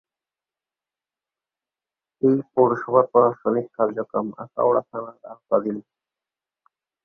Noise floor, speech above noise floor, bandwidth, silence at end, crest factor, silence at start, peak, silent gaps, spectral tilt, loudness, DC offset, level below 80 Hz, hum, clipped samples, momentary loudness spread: under -90 dBFS; over 69 dB; 2.4 kHz; 1.25 s; 22 dB; 2.25 s; -2 dBFS; none; -11.5 dB/octave; -22 LUFS; under 0.1%; -68 dBFS; none; under 0.1%; 14 LU